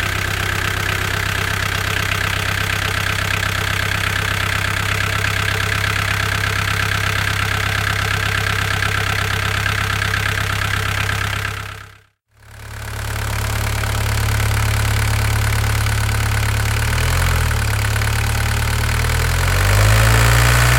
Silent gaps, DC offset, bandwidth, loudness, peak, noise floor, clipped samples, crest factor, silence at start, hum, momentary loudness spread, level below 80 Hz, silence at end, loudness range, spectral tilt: none; under 0.1%; 17 kHz; -18 LUFS; -2 dBFS; -50 dBFS; under 0.1%; 16 dB; 0 s; none; 4 LU; -24 dBFS; 0 s; 4 LU; -3.5 dB/octave